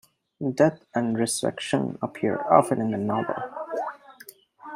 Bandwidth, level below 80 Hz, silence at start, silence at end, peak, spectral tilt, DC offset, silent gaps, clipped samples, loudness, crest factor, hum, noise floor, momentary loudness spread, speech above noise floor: 16 kHz; -68 dBFS; 0.4 s; 0 s; -4 dBFS; -5 dB/octave; under 0.1%; none; under 0.1%; -25 LUFS; 22 dB; none; -50 dBFS; 12 LU; 26 dB